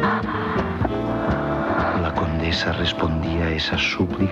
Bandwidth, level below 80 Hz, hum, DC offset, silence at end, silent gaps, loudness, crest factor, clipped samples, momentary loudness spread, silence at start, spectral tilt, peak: 8 kHz; -34 dBFS; none; under 0.1%; 0 s; none; -22 LUFS; 14 dB; under 0.1%; 3 LU; 0 s; -6 dB/octave; -8 dBFS